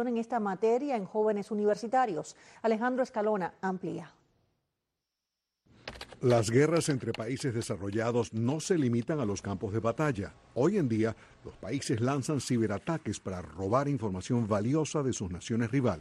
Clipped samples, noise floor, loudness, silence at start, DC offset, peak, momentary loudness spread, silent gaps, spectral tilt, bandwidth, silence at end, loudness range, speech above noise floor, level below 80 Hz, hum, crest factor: under 0.1%; -87 dBFS; -31 LUFS; 0 s; under 0.1%; -14 dBFS; 10 LU; none; -6 dB/octave; 12.5 kHz; 0 s; 4 LU; 57 dB; -62 dBFS; none; 18 dB